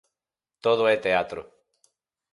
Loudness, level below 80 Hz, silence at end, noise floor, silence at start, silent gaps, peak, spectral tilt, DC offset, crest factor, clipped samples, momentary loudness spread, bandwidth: -24 LUFS; -64 dBFS; 0.9 s; -90 dBFS; 0.65 s; none; -8 dBFS; -5 dB/octave; under 0.1%; 20 dB; under 0.1%; 13 LU; 11.5 kHz